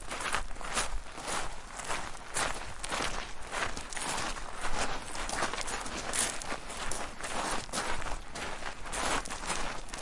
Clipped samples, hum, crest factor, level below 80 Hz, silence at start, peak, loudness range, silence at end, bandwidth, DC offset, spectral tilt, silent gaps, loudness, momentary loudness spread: under 0.1%; none; 22 dB; -44 dBFS; 0 s; -10 dBFS; 1 LU; 0 s; 11.5 kHz; 0.1%; -1.5 dB/octave; none; -35 LUFS; 6 LU